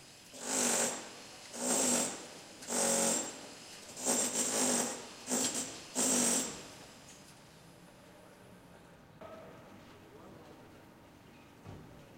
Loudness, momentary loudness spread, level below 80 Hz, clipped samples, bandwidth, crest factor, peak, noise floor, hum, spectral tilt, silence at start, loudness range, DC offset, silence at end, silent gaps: -32 LUFS; 25 LU; -72 dBFS; under 0.1%; 16 kHz; 20 dB; -18 dBFS; -57 dBFS; none; -1.5 dB/octave; 0 s; 22 LU; under 0.1%; 0 s; none